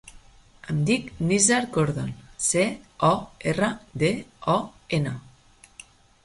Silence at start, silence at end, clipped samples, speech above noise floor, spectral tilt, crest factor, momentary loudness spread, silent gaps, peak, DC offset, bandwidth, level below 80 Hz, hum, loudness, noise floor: 0.05 s; 1.05 s; under 0.1%; 30 dB; -4.5 dB/octave; 20 dB; 11 LU; none; -6 dBFS; under 0.1%; 11.5 kHz; -52 dBFS; none; -24 LUFS; -54 dBFS